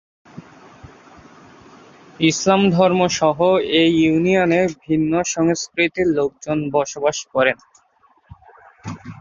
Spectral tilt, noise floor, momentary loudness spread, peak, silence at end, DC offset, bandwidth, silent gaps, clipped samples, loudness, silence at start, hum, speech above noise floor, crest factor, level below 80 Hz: -4.5 dB/octave; -57 dBFS; 7 LU; -2 dBFS; 0.05 s; under 0.1%; 7.4 kHz; none; under 0.1%; -17 LUFS; 0.35 s; none; 40 dB; 18 dB; -54 dBFS